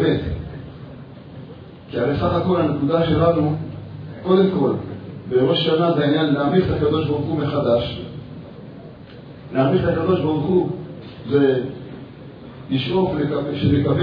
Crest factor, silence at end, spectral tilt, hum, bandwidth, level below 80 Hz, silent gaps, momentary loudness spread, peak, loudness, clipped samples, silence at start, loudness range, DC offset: 16 dB; 0 s; -10 dB/octave; none; 5.2 kHz; -44 dBFS; none; 21 LU; -4 dBFS; -20 LUFS; under 0.1%; 0 s; 3 LU; under 0.1%